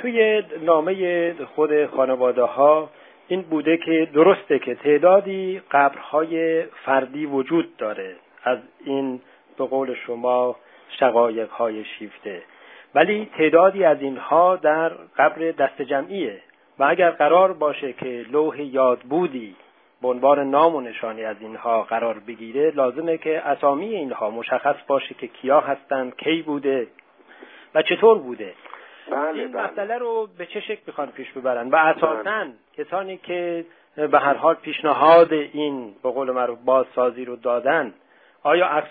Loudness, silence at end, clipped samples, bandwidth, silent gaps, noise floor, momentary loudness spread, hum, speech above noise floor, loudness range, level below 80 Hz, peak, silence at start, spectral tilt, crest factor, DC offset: -21 LUFS; 0 s; under 0.1%; 4.7 kHz; none; -48 dBFS; 14 LU; none; 27 dB; 5 LU; -74 dBFS; -2 dBFS; 0 s; -9 dB/octave; 20 dB; under 0.1%